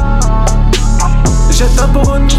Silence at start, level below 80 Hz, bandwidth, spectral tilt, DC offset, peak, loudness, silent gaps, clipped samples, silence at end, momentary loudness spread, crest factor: 0 s; -10 dBFS; 12.5 kHz; -5 dB/octave; under 0.1%; -2 dBFS; -12 LUFS; none; under 0.1%; 0 s; 2 LU; 6 dB